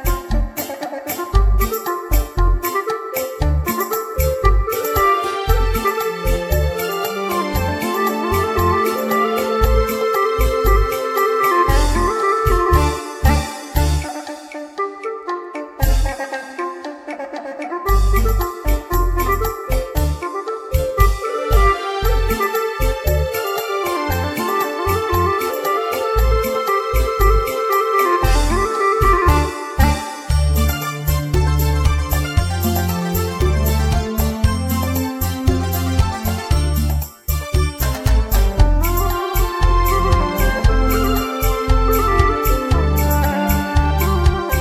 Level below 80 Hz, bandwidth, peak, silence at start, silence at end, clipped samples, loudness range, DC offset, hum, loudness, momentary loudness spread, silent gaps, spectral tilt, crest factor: -20 dBFS; over 20 kHz; 0 dBFS; 0 s; 0 s; under 0.1%; 4 LU; under 0.1%; none; -18 LUFS; 7 LU; none; -5.5 dB/octave; 16 dB